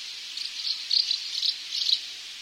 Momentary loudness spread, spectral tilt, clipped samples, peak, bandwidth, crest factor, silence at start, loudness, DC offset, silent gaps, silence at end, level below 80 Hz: 10 LU; 4.5 dB/octave; under 0.1%; -10 dBFS; 16 kHz; 20 dB; 0 s; -26 LUFS; under 0.1%; none; 0 s; -82 dBFS